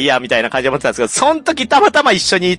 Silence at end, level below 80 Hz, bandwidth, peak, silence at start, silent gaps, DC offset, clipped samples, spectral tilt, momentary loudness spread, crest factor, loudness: 0 s; -48 dBFS; 11.5 kHz; -2 dBFS; 0 s; none; under 0.1%; under 0.1%; -3 dB/octave; 6 LU; 12 dB; -13 LUFS